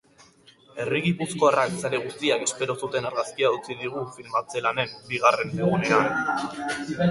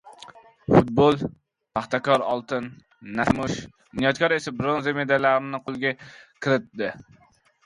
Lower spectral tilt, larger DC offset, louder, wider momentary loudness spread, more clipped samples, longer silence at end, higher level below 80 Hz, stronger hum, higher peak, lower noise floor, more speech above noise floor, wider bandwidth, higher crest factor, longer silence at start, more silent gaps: second, -4.5 dB/octave vs -6 dB/octave; neither; about the same, -25 LUFS vs -24 LUFS; second, 9 LU vs 14 LU; neither; second, 0 s vs 0.65 s; second, -62 dBFS vs -52 dBFS; neither; about the same, -4 dBFS vs -4 dBFS; first, -55 dBFS vs -48 dBFS; first, 30 dB vs 24 dB; about the same, 11.5 kHz vs 11.5 kHz; about the same, 20 dB vs 22 dB; first, 0.75 s vs 0.05 s; neither